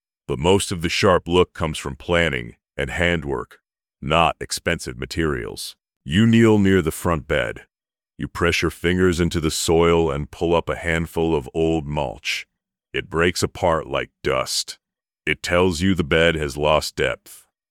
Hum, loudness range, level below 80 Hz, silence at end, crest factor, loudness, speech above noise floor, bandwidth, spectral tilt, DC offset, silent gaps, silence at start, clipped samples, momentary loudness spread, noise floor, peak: none; 4 LU; -42 dBFS; 0.35 s; 18 dB; -21 LUFS; over 70 dB; 17.5 kHz; -5 dB/octave; under 0.1%; 5.96-6.00 s; 0.3 s; under 0.1%; 12 LU; under -90 dBFS; -2 dBFS